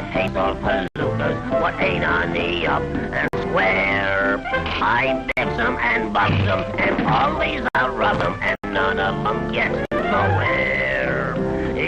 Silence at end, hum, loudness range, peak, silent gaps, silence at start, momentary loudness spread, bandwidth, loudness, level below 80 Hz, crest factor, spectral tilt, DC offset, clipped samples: 0 s; none; 1 LU; -4 dBFS; none; 0 s; 4 LU; 9.6 kHz; -20 LUFS; -38 dBFS; 16 dB; -6.5 dB/octave; under 0.1%; under 0.1%